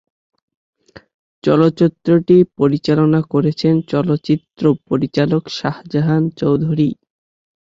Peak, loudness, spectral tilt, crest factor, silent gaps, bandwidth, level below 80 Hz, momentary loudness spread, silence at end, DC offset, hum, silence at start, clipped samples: -2 dBFS; -16 LUFS; -8.5 dB/octave; 14 dB; none; 7.6 kHz; -52 dBFS; 7 LU; 0.7 s; under 0.1%; none; 1.45 s; under 0.1%